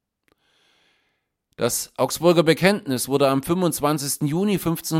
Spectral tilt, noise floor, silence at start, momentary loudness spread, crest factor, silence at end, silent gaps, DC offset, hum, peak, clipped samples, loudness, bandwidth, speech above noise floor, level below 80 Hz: -4.5 dB/octave; -73 dBFS; 1.6 s; 7 LU; 20 dB; 0 s; none; under 0.1%; none; -2 dBFS; under 0.1%; -21 LUFS; 17 kHz; 52 dB; -54 dBFS